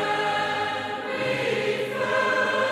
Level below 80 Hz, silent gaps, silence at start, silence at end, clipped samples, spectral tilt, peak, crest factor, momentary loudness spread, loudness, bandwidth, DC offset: -66 dBFS; none; 0 s; 0 s; under 0.1%; -4 dB/octave; -12 dBFS; 14 dB; 5 LU; -25 LUFS; 15 kHz; under 0.1%